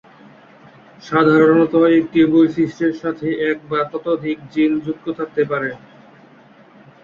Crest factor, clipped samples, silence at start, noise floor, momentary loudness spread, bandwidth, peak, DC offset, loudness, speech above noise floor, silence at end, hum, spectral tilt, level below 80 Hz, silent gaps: 16 dB; under 0.1%; 1.05 s; -47 dBFS; 11 LU; 6.8 kHz; -2 dBFS; under 0.1%; -17 LUFS; 30 dB; 1.25 s; none; -8 dB/octave; -58 dBFS; none